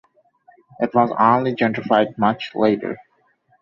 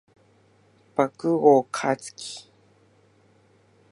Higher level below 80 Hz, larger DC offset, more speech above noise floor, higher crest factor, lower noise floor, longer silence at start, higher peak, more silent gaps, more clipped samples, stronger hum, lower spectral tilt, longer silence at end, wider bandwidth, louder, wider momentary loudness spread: first, -62 dBFS vs -76 dBFS; neither; first, 43 dB vs 38 dB; about the same, 18 dB vs 22 dB; about the same, -62 dBFS vs -60 dBFS; second, 0.8 s vs 1 s; about the same, -2 dBFS vs -4 dBFS; neither; neither; neither; first, -8 dB/octave vs -5.5 dB/octave; second, 0.65 s vs 1.5 s; second, 7.2 kHz vs 11.5 kHz; first, -19 LUFS vs -23 LUFS; second, 10 LU vs 19 LU